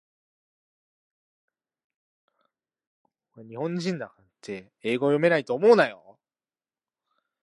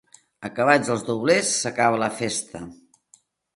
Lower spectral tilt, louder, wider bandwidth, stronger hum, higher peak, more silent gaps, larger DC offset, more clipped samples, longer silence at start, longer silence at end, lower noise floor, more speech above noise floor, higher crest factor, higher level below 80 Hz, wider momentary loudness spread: first, -6.5 dB/octave vs -3.5 dB/octave; about the same, -24 LUFS vs -22 LUFS; about the same, 11 kHz vs 11.5 kHz; neither; about the same, -4 dBFS vs -2 dBFS; neither; neither; neither; first, 3.35 s vs 0.4 s; first, 1.5 s vs 0.8 s; first, under -90 dBFS vs -59 dBFS; first, over 66 dB vs 37 dB; about the same, 24 dB vs 22 dB; second, -80 dBFS vs -62 dBFS; about the same, 20 LU vs 18 LU